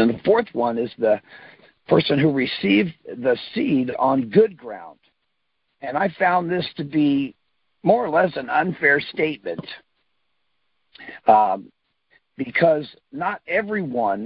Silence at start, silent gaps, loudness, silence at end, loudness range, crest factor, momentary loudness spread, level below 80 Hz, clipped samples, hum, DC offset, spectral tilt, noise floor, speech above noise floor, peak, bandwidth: 0 s; none; -21 LUFS; 0 s; 3 LU; 20 dB; 13 LU; -62 dBFS; under 0.1%; none; under 0.1%; -10.5 dB/octave; -75 dBFS; 55 dB; -2 dBFS; 5.6 kHz